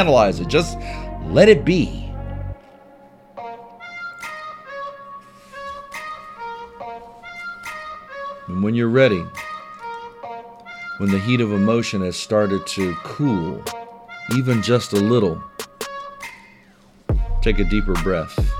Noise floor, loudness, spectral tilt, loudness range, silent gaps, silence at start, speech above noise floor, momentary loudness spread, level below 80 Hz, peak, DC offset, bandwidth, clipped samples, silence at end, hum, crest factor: -51 dBFS; -20 LUFS; -6 dB/octave; 13 LU; none; 0 s; 33 dB; 19 LU; -30 dBFS; 0 dBFS; under 0.1%; 17 kHz; under 0.1%; 0 s; none; 22 dB